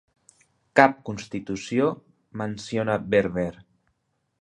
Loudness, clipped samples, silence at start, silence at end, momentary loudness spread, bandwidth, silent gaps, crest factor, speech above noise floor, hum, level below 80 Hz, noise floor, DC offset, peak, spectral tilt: -25 LUFS; under 0.1%; 0.75 s; 0.9 s; 15 LU; 11 kHz; none; 26 dB; 50 dB; none; -56 dBFS; -74 dBFS; under 0.1%; 0 dBFS; -6 dB/octave